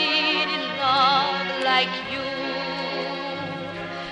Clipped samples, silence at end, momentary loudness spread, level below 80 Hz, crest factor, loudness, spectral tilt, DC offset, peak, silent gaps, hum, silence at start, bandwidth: under 0.1%; 0 s; 12 LU; -60 dBFS; 18 dB; -23 LUFS; -4 dB/octave; under 0.1%; -6 dBFS; none; none; 0 s; 10.5 kHz